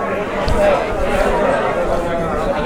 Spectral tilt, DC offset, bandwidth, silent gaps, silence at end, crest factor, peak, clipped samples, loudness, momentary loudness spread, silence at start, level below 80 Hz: -6 dB/octave; under 0.1%; 16.5 kHz; none; 0 s; 14 dB; -4 dBFS; under 0.1%; -17 LUFS; 4 LU; 0 s; -26 dBFS